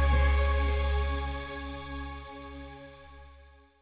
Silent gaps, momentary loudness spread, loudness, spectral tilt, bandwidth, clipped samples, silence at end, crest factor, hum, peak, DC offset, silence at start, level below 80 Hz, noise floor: none; 23 LU; -31 LUFS; -10 dB/octave; 4 kHz; under 0.1%; 0.35 s; 16 dB; none; -14 dBFS; under 0.1%; 0 s; -32 dBFS; -56 dBFS